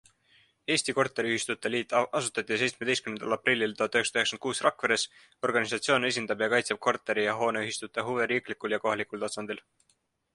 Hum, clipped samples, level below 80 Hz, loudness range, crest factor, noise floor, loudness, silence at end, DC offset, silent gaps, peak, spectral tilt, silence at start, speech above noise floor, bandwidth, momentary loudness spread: none; under 0.1%; -72 dBFS; 2 LU; 22 dB; -65 dBFS; -28 LUFS; 0.75 s; under 0.1%; none; -8 dBFS; -3 dB/octave; 0.7 s; 36 dB; 11.5 kHz; 7 LU